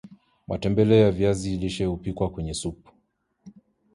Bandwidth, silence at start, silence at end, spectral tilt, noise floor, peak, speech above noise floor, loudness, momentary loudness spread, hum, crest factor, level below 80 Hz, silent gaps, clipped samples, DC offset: 11.5 kHz; 0.05 s; 0.45 s; -6.5 dB/octave; -70 dBFS; -6 dBFS; 47 dB; -24 LUFS; 13 LU; none; 20 dB; -44 dBFS; none; under 0.1%; under 0.1%